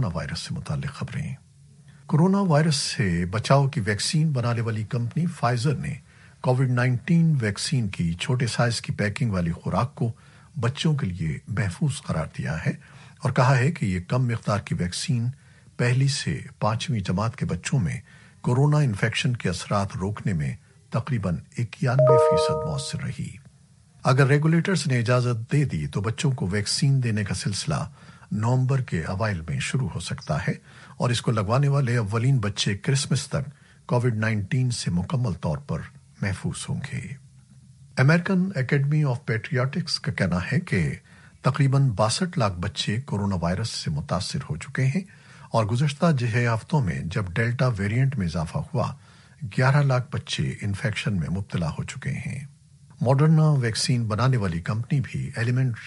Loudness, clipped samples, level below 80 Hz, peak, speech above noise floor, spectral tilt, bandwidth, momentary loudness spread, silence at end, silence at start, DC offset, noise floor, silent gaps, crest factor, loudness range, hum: -25 LUFS; under 0.1%; -50 dBFS; -4 dBFS; 31 dB; -6 dB/octave; 11.5 kHz; 10 LU; 0 s; 0 s; under 0.1%; -55 dBFS; none; 20 dB; 4 LU; none